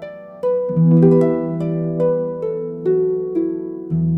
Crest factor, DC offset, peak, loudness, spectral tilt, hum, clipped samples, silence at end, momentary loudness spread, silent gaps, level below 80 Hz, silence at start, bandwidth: 16 dB; under 0.1%; -2 dBFS; -18 LUFS; -12 dB/octave; none; under 0.1%; 0 s; 12 LU; none; -54 dBFS; 0 s; 2.9 kHz